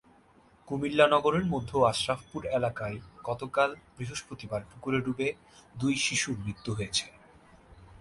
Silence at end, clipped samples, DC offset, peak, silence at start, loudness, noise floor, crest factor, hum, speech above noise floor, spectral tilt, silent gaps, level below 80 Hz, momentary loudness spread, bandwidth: 0 s; under 0.1%; under 0.1%; -8 dBFS; 0.65 s; -30 LUFS; -60 dBFS; 22 dB; none; 31 dB; -4 dB/octave; none; -56 dBFS; 13 LU; 11.5 kHz